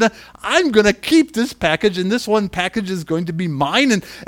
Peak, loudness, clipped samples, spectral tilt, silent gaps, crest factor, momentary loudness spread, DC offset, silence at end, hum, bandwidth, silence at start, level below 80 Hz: 0 dBFS; -17 LUFS; under 0.1%; -4.5 dB/octave; none; 18 dB; 8 LU; under 0.1%; 0.05 s; none; 18 kHz; 0 s; -46 dBFS